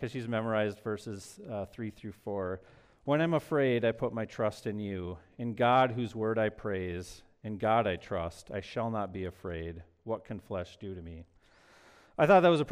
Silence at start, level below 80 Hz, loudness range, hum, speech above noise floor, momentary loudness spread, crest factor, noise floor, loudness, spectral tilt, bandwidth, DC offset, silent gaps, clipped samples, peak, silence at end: 0 s; -60 dBFS; 8 LU; none; 30 dB; 17 LU; 20 dB; -61 dBFS; -32 LUFS; -7 dB/octave; 15 kHz; under 0.1%; none; under 0.1%; -12 dBFS; 0 s